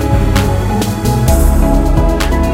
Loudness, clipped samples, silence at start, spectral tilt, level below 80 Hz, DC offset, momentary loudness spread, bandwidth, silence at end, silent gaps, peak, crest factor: -13 LUFS; under 0.1%; 0 s; -6 dB/octave; -14 dBFS; under 0.1%; 3 LU; 16.5 kHz; 0 s; none; 0 dBFS; 10 dB